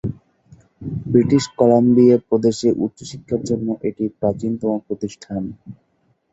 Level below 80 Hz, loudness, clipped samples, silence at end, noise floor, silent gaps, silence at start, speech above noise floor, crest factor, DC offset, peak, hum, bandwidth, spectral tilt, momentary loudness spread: -50 dBFS; -18 LUFS; under 0.1%; 0.6 s; -50 dBFS; none; 0.05 s; 33 dB; 18 dB; under 0.1%; -2 dBFS; none; 8 kHz; -7.5 dB/octave; 16 LU